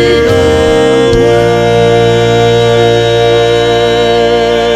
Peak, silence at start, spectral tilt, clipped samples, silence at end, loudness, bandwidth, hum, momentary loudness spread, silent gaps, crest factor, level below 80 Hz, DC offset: 0 dBFS; 0 s; -5.5 dB/octave; under 0.1%; 0 s; -8 LUFS; 13 kHz; none; 1 LU; none; 8 dB; -28 dBFS; under 0.1%